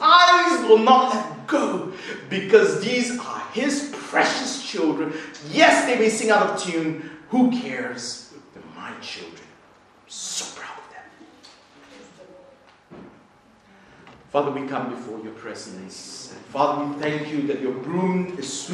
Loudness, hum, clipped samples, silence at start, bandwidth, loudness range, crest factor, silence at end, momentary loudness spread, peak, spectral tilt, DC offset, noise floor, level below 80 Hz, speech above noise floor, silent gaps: -21 LUFS; none; under 0.1%; 0 s; 12 kHz; 15 LU; 22 dB; 0 s; 20 LU; -2 dBFS; -3.5 dB/octave; under 0.1%; -54 dBFS; -70 dBFS; 32 dB; none